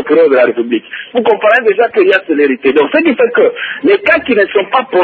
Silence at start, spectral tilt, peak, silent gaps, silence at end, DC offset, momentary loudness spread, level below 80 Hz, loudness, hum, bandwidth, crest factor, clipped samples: 0 s; -6.5 dB/octave; 0 dBFS; none; 0 s; under 0.1%; 6 LU; -54 dBFS; -10 LUFS; none; 4.7 kHz; 10 dB; under 0.1%